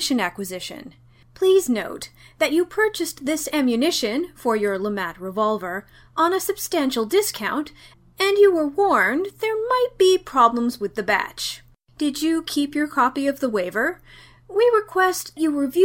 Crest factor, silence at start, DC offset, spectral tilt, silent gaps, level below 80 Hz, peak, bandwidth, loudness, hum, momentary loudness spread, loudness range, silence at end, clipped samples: 18 dB; 0 s; under 0.1%; -3 dB/octave; none; -56 dBFS; -2 dBFS; 17 kHz; -21 LUFS; none; 11 LU; 4 LU; 0 s; under 0.1%